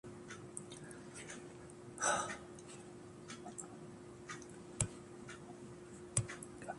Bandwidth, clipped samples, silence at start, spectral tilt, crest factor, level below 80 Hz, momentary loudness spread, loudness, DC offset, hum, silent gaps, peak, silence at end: 11.5 kHz; under 0.1%; 0.05 s; -3.5 dB/octave; 28 dB; -66 dBFS; 15 LU; -45 LUFS; under 0.1%; none; none; -18 dBFS; 0 s